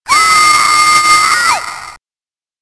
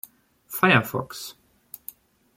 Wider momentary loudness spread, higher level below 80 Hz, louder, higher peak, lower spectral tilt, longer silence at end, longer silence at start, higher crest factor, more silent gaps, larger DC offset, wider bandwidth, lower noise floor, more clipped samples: second, 12 LU vs 24 LU; first, -46 dBFS vs -64 dBFS; first, -7 LUFS vs -22 LUFS; first, 0 dBFS vs -4 dBFS; second, 1 dB/octave vs -5 dB/octave; second, 0.65 s vs 1.05 s; second, 0.05 s vs 0.5 s; second, 10 dB vs 22 dB; neither; neither; second, 11 kHz vs 16.5 kHz; first, under -90 dBFS vs -49 dBFS; neither